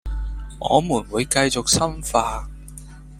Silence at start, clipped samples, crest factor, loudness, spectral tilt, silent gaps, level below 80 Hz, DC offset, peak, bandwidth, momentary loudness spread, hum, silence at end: 0.05 s; under 0.1%; 22 dB; -21 LUFS; -3.5 dB/octave; none; -34 dBFS; under 0.1%; -2 dBFS; 16 kHz; 20 LU; none; 0 s